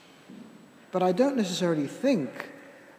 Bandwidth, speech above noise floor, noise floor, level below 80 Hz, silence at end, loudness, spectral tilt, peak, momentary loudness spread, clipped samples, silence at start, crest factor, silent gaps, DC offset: 16 kHz; 25 dB; -51 dBFS; -80 dBFS; 0.05 s; -27 LUFS; -5.5 dB/octave; -10 dBFS; 24 LU; under 0.1%; 0.3 s; 18 dB; none; under 0.1%